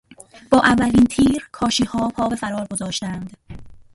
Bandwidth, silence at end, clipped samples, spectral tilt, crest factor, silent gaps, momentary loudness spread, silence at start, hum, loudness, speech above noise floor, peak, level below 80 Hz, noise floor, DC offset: 11.5 kHz; 0.15 s; under 0.1%; -4.5 dB/octave; 20 dB; none; 11 LU; 0.35 s; none; -19 LUFS; 19 dB; 0 dBFS; -42 dBFS; -37 dBFS; under 0.1%